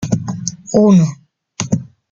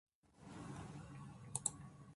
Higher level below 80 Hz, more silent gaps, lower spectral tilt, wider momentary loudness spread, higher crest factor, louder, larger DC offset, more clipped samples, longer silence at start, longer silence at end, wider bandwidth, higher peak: first, -48 dBFS vs -70 dBFS; neither; first, -6.5 dB/octave vs -3.5 dB/octave; about the same, 13 LU vs 15 LU; second, 14 dB vs 30 dB; first, -16 LUFS vs -48 LUFS; neither; neither; second, 0 s vs 0.25 s; first, 0.25 s vs 0 s; second, 7.6 kHz vs 11.5 kHz; first, 0 dBFS vs -20 dBFS